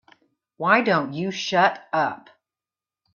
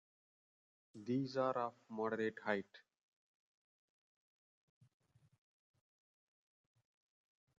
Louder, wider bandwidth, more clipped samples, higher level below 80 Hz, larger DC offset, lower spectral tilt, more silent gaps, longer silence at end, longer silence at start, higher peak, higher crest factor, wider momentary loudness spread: first, -22 LUFS vs -41 LUFS; about the same, 7.2 kHz vs 7.4 kHz; neither; first, -70 dBFS vs -90 dBFS; neither; about the same, -5 dB/octave vs -5 dB/octave; neither; second, 1 s vs 4.8 s; second, 0.6 s vs 0.95 s; first, -4 dBFS vs -22 dBFS; second, 20 dB vs 26 dB; about the same, 9 LU vs 8 LU